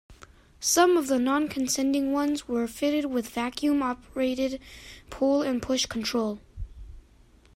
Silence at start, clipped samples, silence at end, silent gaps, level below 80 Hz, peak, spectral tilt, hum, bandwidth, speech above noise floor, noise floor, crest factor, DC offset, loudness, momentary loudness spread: 0.1 s; under 0.1%; 0.55 s; none; -50 dBFS; -8 dBFS; -3 dB/octave; none; 16 kHz; 30 dB; -56 dBFS; 20 dB; under 0.1%; -26 LUFS; 18 LU